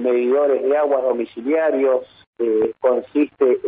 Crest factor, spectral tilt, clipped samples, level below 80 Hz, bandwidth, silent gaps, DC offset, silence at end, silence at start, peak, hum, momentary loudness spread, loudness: 12 dB; -10 dB/octave; under 0.1%; -66 dBFS; 3.9 kHz; 2.27-2.33 s; under 0.1%; 0 s; 0 s; -6 dBFS; none; 5 LU; -19 LUFS